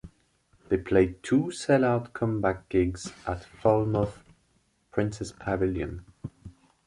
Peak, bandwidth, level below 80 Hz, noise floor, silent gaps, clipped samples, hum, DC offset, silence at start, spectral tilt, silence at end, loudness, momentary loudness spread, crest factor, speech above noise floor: -8 dBFS; 11.5 kHz; -48 dBFS; -69 dBFS; none; under 0.1%; none; under 0.1%; 0.05 s; -7 dB/octave; 0.35 s; -27 LUFS; 12 LU; 20 dB; 42 dB